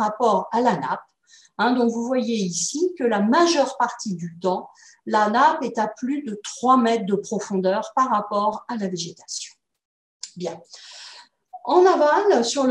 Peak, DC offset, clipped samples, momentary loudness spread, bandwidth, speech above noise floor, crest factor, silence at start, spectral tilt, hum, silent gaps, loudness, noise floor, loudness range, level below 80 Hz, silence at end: -4 dBFS; under 0.1%; under 0.1%; 16 LU; 11.5 kHz; 25 dB; 18 dB; 0 s; -4 dB/octave; none; 9.85-10.20 s; -21 LUFS; -46 dBFS; 6 LU; -72 dBFS; 0 s